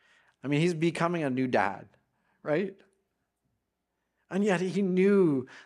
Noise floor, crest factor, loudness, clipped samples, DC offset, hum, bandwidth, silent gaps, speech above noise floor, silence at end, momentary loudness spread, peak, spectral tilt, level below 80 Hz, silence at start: -82 dBFS; 18 dB; -28 LUFS; under 0.1%; under 0.1%; none; 11 kHz; none; 55 dB; 0.05 s; 13 LU; -10 dBFS; -7 dB/octave; -80 dBFS; 0.45 s